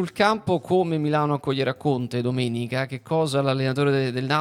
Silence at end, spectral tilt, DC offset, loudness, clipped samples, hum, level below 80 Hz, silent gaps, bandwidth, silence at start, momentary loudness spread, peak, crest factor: 0 s; -6.5 dB/octave; under 0.1%; -23 LUFS; under 0.1%; none; -64 dBFS; none; 14 kHz; 0 s; 4 LU; -6 dBFS; 16 dB